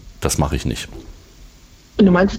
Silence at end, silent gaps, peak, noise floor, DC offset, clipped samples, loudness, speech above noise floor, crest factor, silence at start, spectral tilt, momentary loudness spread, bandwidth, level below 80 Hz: 0 s; none; -4 dBFS; -46 dBFS; under 0.1%; under 0.1%; -19 LUFS; 29 dB; 16 dB; 0.05 s; -5.5 dB/octave; 18 LU; 16 kHz; -32 dBFS